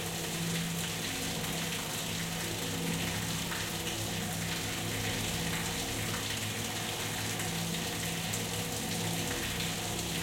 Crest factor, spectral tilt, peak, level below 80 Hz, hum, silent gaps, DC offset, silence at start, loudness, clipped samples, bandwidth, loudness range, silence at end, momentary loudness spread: 16 dB; -3 dB/octave; -20 dBFS; -52 dBFS; none; none; under 0.1%; 0 s; -33 LUFS; under 0.1%; 16.5 kHz; 0 LU; 0 s; 1 LU